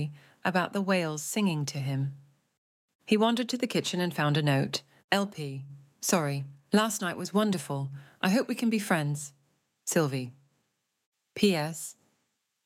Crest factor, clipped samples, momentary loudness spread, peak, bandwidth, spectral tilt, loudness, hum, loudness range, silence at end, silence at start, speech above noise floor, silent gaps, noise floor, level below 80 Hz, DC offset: 20 dB; under 0.1%; 12 LU; -10 dBFS; 16.5 kHz; -4.5 dB/octave; -29 LUFS; none; 3 LU; 0.75 s; 0 s; 50 dB; 2.58-2.88 s, 2.95-2.99 s, 5.04-5.08 s, 11.06-11.12 s; -78 dBFS; -76 dBFS; under 0.1%